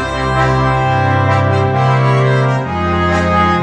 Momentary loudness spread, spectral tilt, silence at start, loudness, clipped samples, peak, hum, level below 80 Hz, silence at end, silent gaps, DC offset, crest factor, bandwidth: 3 LU; -7 dB/octave; 0 s; -13 LUFS; under 0.1%; -2 dBFS; none; -30 dBFS; 0 s; none; under 0.1%; 12 dB; 9.4 kHz